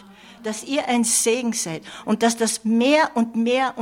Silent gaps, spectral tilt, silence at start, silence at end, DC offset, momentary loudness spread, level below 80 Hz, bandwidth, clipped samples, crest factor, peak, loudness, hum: none; -3 dB/octave; 0.25 s; 0 s; under 0.1%; 12 LU; -66 dBFS; 16.5 kHz; under 0.1%; 14 dB; -6 dBFS; -20 LUFS; none